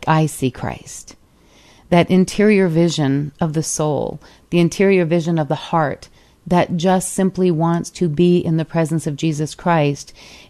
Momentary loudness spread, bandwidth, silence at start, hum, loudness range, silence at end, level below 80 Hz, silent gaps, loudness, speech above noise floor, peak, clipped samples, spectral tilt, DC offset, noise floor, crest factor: 12 LU; 13.5 kHz; 0 s; none; 2 LU; 0.15 s; -48 dBFS; none; -17 LUFS; 33 dB; -2 dBFS; under 0.1%; -6 dB/octave; under 0.1%; -50 dBFS; 16 dB